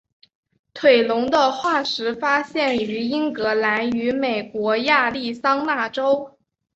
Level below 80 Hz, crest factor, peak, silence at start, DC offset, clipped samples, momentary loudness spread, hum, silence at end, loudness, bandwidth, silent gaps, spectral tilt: -62 dBFS; 18 dB; -2 dBFS; 0.75 s; under 0.1%; under 0.1%; 6 LU; none; 0.5 s; -20 LUFS; 8 kHz; none; -4 dB/octave